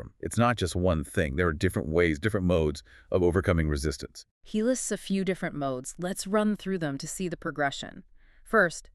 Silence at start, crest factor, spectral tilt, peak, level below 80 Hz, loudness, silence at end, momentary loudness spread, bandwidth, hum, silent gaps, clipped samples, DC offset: 0 s; 18 dB; -5.5 dB/octave; -10 dBFS; -42 dBFS; -28 LUFS; 0.15 s; 9 LU; 13.5 kHz; none; 4.31-4.41 s; under 0.1%; under 0.1%